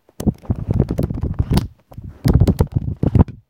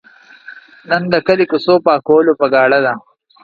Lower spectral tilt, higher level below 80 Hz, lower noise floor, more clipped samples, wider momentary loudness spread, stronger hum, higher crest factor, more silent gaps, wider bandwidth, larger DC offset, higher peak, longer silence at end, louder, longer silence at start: about the same, -8.5 dB/octave vs -7.5 dB/octave; first, -26 dBFS vs -58 dBFS; about the same, -36 dBFS vs -39 dBFS; neither; first, 10 LU vs 7 LU; neither; about the same, 18 dB vs 14 dB; neither; first, 17 kHz vs 5 kHz; neither; about the same, 0 dBFS vs 0 dBFS; second, 0.15 s vs 0.45 s; second, -19 LUFS vs -13 LUFS; second, 0.2 s vs 0.5 s